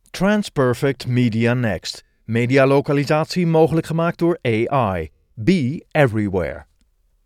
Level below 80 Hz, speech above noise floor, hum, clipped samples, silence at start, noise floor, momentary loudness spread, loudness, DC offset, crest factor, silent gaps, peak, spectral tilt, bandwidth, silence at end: -48 dBFS; 43 dB; none; under 0.1%; 0.15 s; -61 dBFS; 10 LU; -19 LUFS; under 0.1%; 16 dB; none; -2 dBFS; -7 dB/octave; 15.5 kHz; 0.6 s